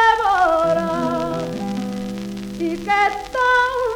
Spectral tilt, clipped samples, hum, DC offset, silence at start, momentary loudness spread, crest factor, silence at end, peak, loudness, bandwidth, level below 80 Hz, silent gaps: -5 dB/octave; under 0.1%; none; under 0.1%; 0 s; 11 LU; 14 dB; 0 s; -4 dBFS; -20 LUFS; 19 kHz; -44 dBFS; none